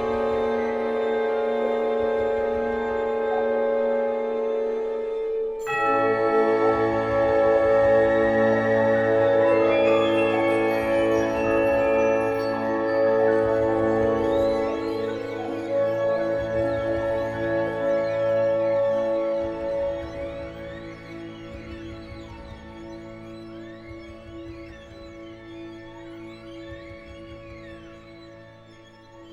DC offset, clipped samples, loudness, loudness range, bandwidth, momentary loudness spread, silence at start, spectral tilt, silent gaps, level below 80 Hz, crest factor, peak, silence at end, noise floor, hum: under 0.1%; under 0.1%; -23 LUFS; 20 LU; 11.5 kHz; 21 LU; 0 s; -7 dB/octave; none; -48 dBFS; 14 dB; -8 dBFS; 0 s; -48 dBFS; none